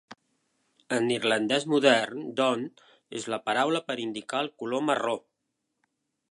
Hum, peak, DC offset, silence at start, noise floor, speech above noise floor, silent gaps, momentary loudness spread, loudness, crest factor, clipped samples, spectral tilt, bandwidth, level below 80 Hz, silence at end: none; -6 dBFS; under 0.1%; 0.1 s; -81 dBFS; 54 dB; none; 11 LU; -27 LUFS; 24 dB; under 0.1%; -4 dB/octave; 11.5 kHz; -78 dBFS; 1.15 s